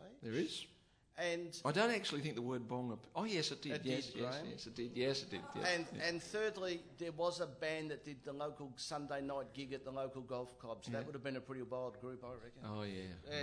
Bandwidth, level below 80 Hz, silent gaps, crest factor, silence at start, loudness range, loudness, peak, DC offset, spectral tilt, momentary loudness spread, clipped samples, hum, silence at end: 11 kHz; -74 dBFS; none; 22 dB; 0 s; 6 LU; -43 LUFS; -20 dBFS; under 0.1%; -4.5 dB/octave; 10 LU; under 0.1%; none; 0 s